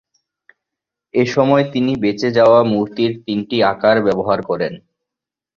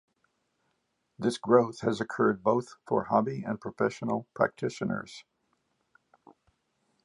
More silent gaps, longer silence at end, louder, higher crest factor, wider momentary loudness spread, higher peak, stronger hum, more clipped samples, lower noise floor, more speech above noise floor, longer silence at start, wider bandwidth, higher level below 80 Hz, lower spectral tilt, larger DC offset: neither; second, 0.8 s vs 1.85 s; first, -16 LUFS vs -29 LUFS; second, 16 dB vs 24 dB; about the same, 10 LU vs 11 LU; first, -2 dBFS vs -8 dBFS; neither; neither; first, -85 dBFS vs -77 dBFS; first, 70 dB vs 49 dB; about the same, 1.15 s vs 1.2 s; second, 7.2 kHz vs 11 kHz; first, -54 dBFS vs -70 dBFS; about the same, -6.5 dB/octave vs -6.5 dB/octave; neither